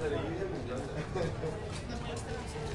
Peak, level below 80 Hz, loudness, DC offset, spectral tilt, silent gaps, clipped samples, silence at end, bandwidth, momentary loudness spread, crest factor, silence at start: -22 dBFS; -48 dBFS; -38 LUFS; under 0.1%; -6 dB/octave; none; under 0.1%; 0 s; 11.5 kHz; 4 LU; 14 dB; 0 s